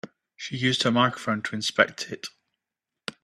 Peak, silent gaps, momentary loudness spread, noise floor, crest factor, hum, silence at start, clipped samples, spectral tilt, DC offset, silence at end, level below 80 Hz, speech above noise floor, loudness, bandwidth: -2 dBFS; none; 17 LU; -87 dBFS; 26 dB; none; 0.05 s; under 0.1%; -4 dB/octave; under 0.1%; 0.1 s; -68 dBFS; 62 dB; -25 LUFS; 13 kHz